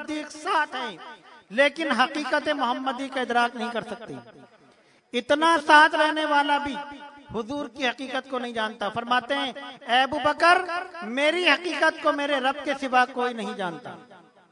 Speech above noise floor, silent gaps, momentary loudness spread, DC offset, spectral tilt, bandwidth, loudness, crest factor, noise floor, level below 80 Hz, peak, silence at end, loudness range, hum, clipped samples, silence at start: 34 dB; none; 16 LU; under 0.1%; -3 dB/octave; 11 kHz; -24 LUFS; 22 dB; -58 dBFS; -66 dBFS; -2 dBFS; 0.35 s; 5 LU; none; under 0.1%; 0 s